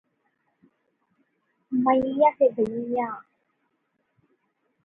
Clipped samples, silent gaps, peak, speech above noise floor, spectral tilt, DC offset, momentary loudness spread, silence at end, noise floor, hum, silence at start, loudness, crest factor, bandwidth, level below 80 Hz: under 0.1%; none; -8 dBFS; 52 dB; -8.5 dB/octave; under 0.1%; 11 LU; 1.65 s; -74 dBFS; none; 1.7 s; -24 LUFS; 20 dB; 3.8 kHz; -66 dBFS